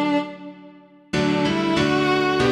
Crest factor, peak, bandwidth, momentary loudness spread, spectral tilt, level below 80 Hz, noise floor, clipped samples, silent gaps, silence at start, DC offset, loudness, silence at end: 14 dB; -8 dBFS; 11.5 kHz; 16 LU; -5.5 dB/octave; -48 dBFS; -47 dBFS; under 0.1%; none; 0 s; under 0.1%; -21 LUFS; 0 s